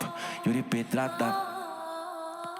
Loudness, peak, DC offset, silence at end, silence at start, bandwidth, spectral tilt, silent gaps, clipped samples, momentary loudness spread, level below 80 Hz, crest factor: -32 LUFS; -14 dBFS; under 0.1%; 0 s; 0 s; 17.5 kHz; -5.5 dB/octave; none; under 0.1%; 9 LU; -76 dBFS; 18 dB